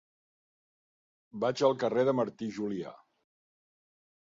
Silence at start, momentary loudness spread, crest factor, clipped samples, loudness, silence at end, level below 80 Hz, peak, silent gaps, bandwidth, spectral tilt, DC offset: 1.35 s; 13 LU; 22 dB; under 0.1%; -31 LUFS; 1.3 s; -76 dBFS; -12 dBFS; none; 7.8 kHz; -6 dB/octave; under 0.1%